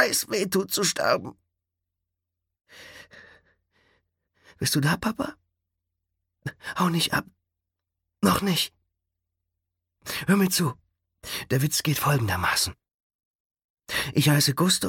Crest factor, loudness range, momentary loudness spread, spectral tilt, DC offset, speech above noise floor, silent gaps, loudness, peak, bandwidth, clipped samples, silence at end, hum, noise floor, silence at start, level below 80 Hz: 22 dB; 6 LU; 15 LU; -4 dB/octave; under 0.1%; 60 dB; 12.94-13.19 s, 13.25-13.50 s, 13.64-13.77 s; -24 LUFS; -6 dBFS; 17.5 kHz; under 0.1%; 0 s; none; -85 dBFS; 0 s; -56 dBFS